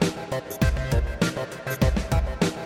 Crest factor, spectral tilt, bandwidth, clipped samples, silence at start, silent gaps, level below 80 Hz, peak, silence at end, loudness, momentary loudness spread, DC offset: 16 dB; -5.5 dB/octave; 18.5 kHz; under 0.1%; 0 s; none; -30 dBFS; -8 dBFS; 0 s; -26 LUFS; 8 LU; under 0.1%